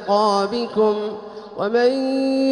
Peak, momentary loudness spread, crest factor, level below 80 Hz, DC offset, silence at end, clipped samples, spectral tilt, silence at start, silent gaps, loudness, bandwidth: -6 dBFS; 11 LU; 14 dB; -64 dBFS; under 0.1%; 0 s; under 0.1%; -5.5 dB/octave; 0 s; none; -20 LUFS; 11 kHz